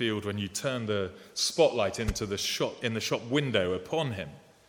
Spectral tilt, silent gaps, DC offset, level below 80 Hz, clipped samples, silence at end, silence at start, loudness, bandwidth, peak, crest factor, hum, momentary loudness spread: -4 dB/octave; none; under 0.1%; -48 dBFS; under 0.1%; 0.3 s; 0 s; -30 LUFS; 18 kHz; -10 dBFS; 20 dB; none; 8 LU